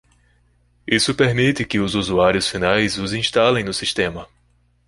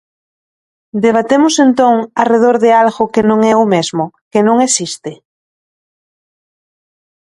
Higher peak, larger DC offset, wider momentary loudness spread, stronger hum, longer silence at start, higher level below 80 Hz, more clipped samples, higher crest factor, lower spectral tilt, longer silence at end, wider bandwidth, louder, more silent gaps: about the same, 0 dBFS vs 0 dBFS; neither; second, 6 LU vs 10 LU; first, 60 Hz at -40 dBFS vs none; about the same, 0.85 s vs 0.95 s; first, -44 dBFS vs -56 dBFS; neither; first, 20 dB vs 14 dB; about the same, -4.5 dB/octave vs -4 dB/octave; second, 0.65 s vs 2.25 s; about the same, 11.5 kHz vs 11.5 kHz; second, -18 LUFS vs -11 LUFS; second, none vs 4.21-4.31 s